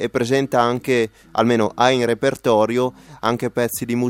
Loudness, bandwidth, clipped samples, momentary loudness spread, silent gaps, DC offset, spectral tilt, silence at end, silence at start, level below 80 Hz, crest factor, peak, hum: -19 LUFS; 17 kHz; under 0.1%; 6 LU; none; under 0.1%; -5 dB/octave; 0 s; 0 s; -54 dBFS; 18 dB; 0 dBFS; none